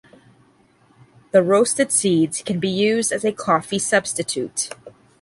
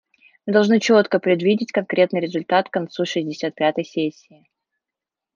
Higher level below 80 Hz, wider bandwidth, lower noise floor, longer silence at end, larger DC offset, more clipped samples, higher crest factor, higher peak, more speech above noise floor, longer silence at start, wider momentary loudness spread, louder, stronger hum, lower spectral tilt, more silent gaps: first, -62 dBFS vs -70 dBFS; first, 11.5 kHz vs 7.2 kHz; second, -56 dBFS vs -87 dBFS; second, 0.3 s vs 1.25 s; neither; neither; about the same, 18 dB vs 16 dB; about the same, -2 dBFS vs -4 dBFS; second, 37 dB vs 67 dB; first, 1.35 s vs 0.45 s; about the same, 8 LU vs 9 LU; about the same, -19 LUFS vs -20 LUFS; neither; second, -3.5 dB/octave vs -5.5 dB/octave; neither